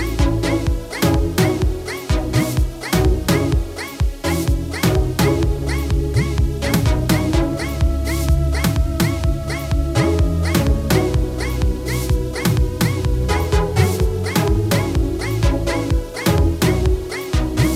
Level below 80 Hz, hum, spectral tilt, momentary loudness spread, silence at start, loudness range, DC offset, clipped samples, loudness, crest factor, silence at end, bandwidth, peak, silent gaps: -22 dBFS; none; -6 dB/octave; 5 LU; 0 s; 1 LU; under 0.1%; under 0.1%; -19 LUFS; 16 dB; 0 s; 16.5 kHz; -2 dBFS; none